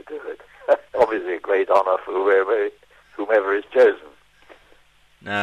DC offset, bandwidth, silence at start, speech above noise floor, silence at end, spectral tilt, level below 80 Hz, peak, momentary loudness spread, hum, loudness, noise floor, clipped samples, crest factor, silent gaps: under 0.1%; 9 kHz; 0.1 s; 37 dB; 0 s; -5.5 dB/octave; -62 dBFS; -6 dBFS; 17 LU; none; -20 LUFS; -55 dBFS; under 0.1%; 16 dB; none